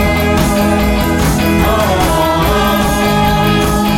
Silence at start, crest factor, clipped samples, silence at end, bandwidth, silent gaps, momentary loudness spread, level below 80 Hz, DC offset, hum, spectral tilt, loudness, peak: 0 s; 10 dB; under 0.1%; 0 s; 16.5 kHz; none; 1 LU; -20 dBFS; under 0.1%; none; -5 dB/octave; -12 LUFS; 0 dBFS